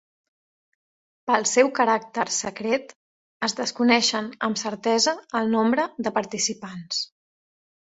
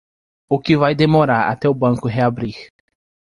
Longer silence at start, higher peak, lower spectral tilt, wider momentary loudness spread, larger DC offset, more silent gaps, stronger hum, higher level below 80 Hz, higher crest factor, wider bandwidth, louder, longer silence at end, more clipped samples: first, 1.25 s vs 0.5 s; about the same, -4 dBFS vs -2 dBFS; second, -2.5 dB/octave vs -8 dB/octave; about the same, 9 LU vs 11 LU; neither; first, 2.95-3.40 s vs none; neither; second, -68 dBFS vs -48 dBFS; about the same, 20 dB vs 16 dB; second, 8.2 kHz vs 11.5 kHz; second, -23 LUFS vs -17 LUFS; first, 0.9 s vs 0.6 s; neither